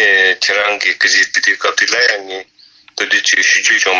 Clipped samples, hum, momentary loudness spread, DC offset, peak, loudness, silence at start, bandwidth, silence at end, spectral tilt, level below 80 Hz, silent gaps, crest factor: under 0.1%; none; 11 LU; under 0.1%; 0 dBFS; -11 LUFS; 0 s; 8 kHz; 0 s; 1.5 dB/octave; -62 dBFS; none; 12 dB